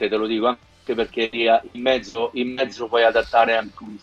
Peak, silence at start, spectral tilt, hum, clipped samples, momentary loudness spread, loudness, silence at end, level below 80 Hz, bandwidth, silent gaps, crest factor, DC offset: -4 dBFS; 0 s; -4.5 dB/octave; none; under 0.1%; 8 LU; -21 LUFS; 0.05 s; -52 dBFS; 8.8 kHz; none; 18 dB; under 0.1%